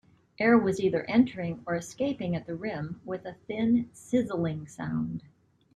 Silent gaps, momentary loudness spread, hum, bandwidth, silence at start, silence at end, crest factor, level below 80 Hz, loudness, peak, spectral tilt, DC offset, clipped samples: none; 13 LU; none; 11.5 kHz; 0.4 s; 0.55 s; 18 dB; -62 dBFS; -29 LUFS; -10 dBFS; -7 dB/octave; under 0.1%; under 0.1%